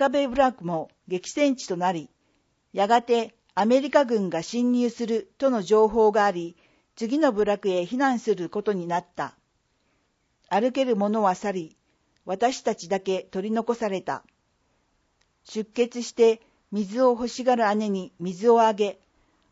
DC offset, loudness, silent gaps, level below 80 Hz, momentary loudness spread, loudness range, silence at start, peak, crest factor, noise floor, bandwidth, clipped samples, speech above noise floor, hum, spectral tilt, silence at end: under 0.1%; -24 LUFS; none; -62 dBFS; 13 LU; 6 LU; 0 s; -6 dBFS; 20 dB; -70 dBFS; 8 kHz; under 0.1%; 47 dB; none; -5 dB/octave; 0.6 s